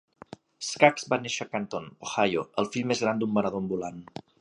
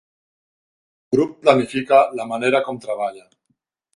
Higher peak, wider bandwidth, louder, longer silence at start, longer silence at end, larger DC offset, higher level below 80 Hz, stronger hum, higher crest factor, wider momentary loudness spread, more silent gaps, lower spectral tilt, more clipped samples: about the same, -2 dBFS vs 0 dBFS; about the same, 11 kHz vs 11.5 kHz; second, -28 LUFS vs -19 LUFS; second, 0.6 s vs 1.1 s; second, 0.35 s vs 0.75 s; neither; about the same, -66 dBFS vs -64 dBFS; neither; first, 26 dB vs 20 dB; first, 14 LU vs 10 LU; neither; about the same, -4.5 dB/octave vs -5.5 dB/octave; neither